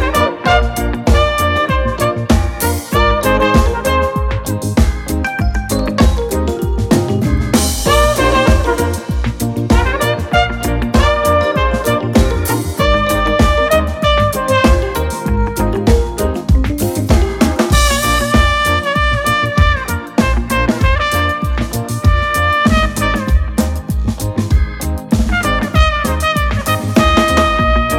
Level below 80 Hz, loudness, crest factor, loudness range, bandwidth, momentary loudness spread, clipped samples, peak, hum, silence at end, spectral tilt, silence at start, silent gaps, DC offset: -18 dBFS; -14 LUFS; 12 dB; 2 LU; 17 kHz; 6 LU; under 0.1%; 0 dBFS; none; 0 s; -5 dB/octave; 0 s; none; under 0.1%